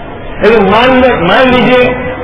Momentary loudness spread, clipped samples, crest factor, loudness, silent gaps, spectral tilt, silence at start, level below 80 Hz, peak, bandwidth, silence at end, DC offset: 5 LU; 3%; 8 dB; -7 LUFS; none; -7.5 dB/octave; 0 s; -28 dBFS; 0 dBFS; 5.4 kHz; 0 s; under 0.1%